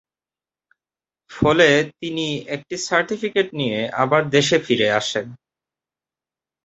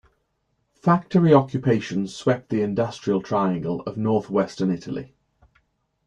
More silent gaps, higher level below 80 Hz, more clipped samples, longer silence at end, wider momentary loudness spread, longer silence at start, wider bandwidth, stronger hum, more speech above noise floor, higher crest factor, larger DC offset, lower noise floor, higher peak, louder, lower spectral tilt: neither; first, -52 dBFS vs -58 dBFS; neither; first, 1.3 s vs 1 s; about the same, 11 LU vs 10 LU; first, 1.3 s vs 0.85 s; second, 8.2 kHz vs 9.6 kHz; neither; first, over 71 dB vs 50 dB; about the same, 20 dB vs 20 dB; neither; first, under -90 dBFS vs -72 dBFS; about the same, -2 dBFS vs -4 dBFS; first, -19 LUFS vs -22 LUFS; second, -4 dB/octave vs -7.5 dB/octave